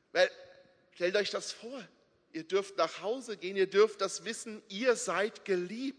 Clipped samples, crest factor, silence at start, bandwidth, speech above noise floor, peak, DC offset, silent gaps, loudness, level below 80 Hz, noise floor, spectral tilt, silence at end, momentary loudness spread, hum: under 0.1%; 22 dB; 0.15 s; 10.5 kHz; 28 dB; -12 dBFS; under 0.1%; none; -32 LUFS; -86 dBFS; -60 dBFS; -3 dB/octave; 0.05 s; 14 LU; none